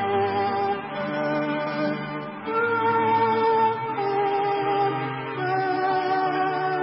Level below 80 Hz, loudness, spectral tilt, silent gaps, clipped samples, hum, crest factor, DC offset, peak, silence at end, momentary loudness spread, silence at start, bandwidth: -64 dBFS; -24 LUFS; -10 dB/octave; none; under 0.1%; none; 12 dB; under 0.1%; -12 dBFS; 0 s; 8 LU; 0 s; 5.8 kHz